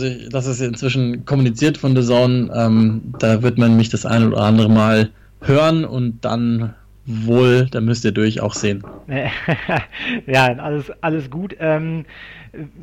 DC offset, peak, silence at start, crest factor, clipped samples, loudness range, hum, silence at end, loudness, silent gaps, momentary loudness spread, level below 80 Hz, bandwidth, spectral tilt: under 0.1%; -6 dBFS; 0 s; 12 dB; under 0.1%; 5 LU; none; 0 s; -17 LUFS; none; 12 LU; -46 dBFS; 9.6 kHz; -6.5 dB/octave